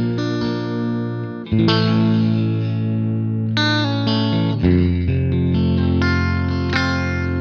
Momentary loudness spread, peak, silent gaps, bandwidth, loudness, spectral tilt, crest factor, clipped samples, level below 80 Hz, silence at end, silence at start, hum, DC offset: 6 LU; -4 dBFS; none; 6.8 kHz; -19 LUFS; -7.5 dB/octave; 14 dB; under 0.1%; -42 dBFS; 0 s; 0 s; none; under 0.1%